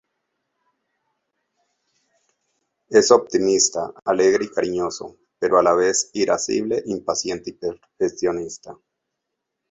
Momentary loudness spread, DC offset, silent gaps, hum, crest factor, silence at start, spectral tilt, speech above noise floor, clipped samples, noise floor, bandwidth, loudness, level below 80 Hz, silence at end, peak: 13 LU; under 0.1%; none; none; 20 dB; 2.9 s; -3 dB/octave; 60 dB; under 0.1%; -80 dBFS; 8 kHz; -20 LUFS; -60 dBFS; 0.95 s; -2 dBFS